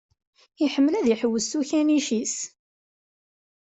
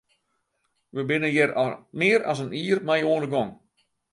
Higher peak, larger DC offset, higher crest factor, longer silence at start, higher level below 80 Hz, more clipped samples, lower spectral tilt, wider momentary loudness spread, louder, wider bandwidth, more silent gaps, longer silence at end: second, -10 dBFS vs -6 dBFS; neither; about the same, 16 dB vs 18 dB; second, 0.6 s vs 0.95 s; about the same, -68 dBFS vs -68 dBFS; neither; second, -3.5 dB/octave vs -5.5 dB/octave; about the same, 7 LU vs 8 LU; about the same, -24 LUFS vs -24 LUFS; second, 8.2 kHz vs 11.5 kHz; neither; first, 1.15 s vs 0.6 s